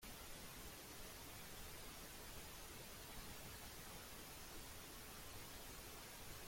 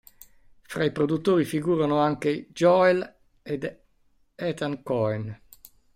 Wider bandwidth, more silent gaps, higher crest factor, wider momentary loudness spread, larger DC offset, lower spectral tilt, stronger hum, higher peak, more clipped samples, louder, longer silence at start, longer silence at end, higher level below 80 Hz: about the same, 16.5 kHz vs 16 kHz; neither; about the same, 14 dB vs 18 dB; second, 1 LU vs 15 LU; neither; second, -2.5 dB/octave vs -6.5 dB/octave; neither; second, -42 dBFS vs -8 dBFS; neither; second, -54 LUFS vs -25 LUFS; second, 0 s vs 0.7 s; second, 0 s vs 0.6 s; about the same, -64 dBFS vs -62 dBFS